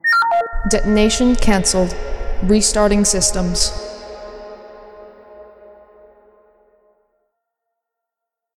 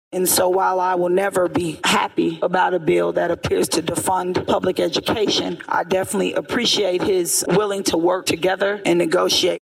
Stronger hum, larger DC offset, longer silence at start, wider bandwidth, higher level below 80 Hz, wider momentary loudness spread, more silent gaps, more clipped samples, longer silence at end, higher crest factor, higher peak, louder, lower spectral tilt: neither; neither; about the same, 0.05 s vs 0.1 s; second, 14.5 kHz vs 16 kHz; first, -26 dBFS vs -52 dBFS; first, 20 LU vs 4 LU; neither; neither; first, 3.15 s vs 0.2 s; about the same, 18 dB vs 14 dB; first, 0 dBFS vs -6 dBFS; first, -16 LUFS vs -19 LUFS; about the same, -3.5 dB/octave vs -3.5 dB/octave